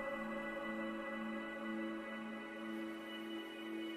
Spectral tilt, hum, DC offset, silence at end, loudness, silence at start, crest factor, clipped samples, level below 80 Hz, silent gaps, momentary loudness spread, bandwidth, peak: -5 dB/octave; none; under 0.1%; 0 s; -44 LUFS; 0 s; 12 dB; under 0.1%; -72 dBFS; none; 4 LU; 15 kHz; -32 dBFS